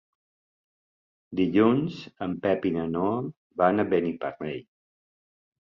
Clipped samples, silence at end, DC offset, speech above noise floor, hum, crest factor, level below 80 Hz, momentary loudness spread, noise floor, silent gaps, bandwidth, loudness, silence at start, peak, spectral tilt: under 0.1%; 1.15 s; under 0.1%; over 65 dB; none; 20 dB; -60 dBFS; 14 LU; under -90 dBFS; 3.37-3.50 s; 7 kHz; -26 LUFS; 1.3 s; -8 dBFS; -9 dB/octave